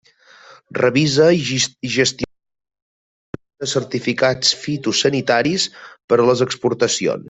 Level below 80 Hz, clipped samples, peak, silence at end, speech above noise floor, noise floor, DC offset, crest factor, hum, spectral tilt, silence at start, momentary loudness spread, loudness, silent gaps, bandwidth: -56 dBFS; under 0.1%; -2 dBFS; 0 s; 29 dB; -47 dBFS; under 0.1%; 18 dB; none; -4 dB/octave; 0.7 s; 13 LU; -17 LUFS; 2.82-3.33 s, 6.04-6.08 s; 8.4 kHz